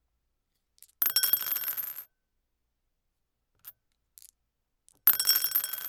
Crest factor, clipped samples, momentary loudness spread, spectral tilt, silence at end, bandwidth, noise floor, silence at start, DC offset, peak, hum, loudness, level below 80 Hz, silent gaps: 26 dB; under 0.1%; 12 LU; 2.5 dB/octave; 0 s; over 20 kHz; -80 dBFS; 1 s; under 0.1%; -6 dBFS; none; -25 LUFS; -78 dBFS; none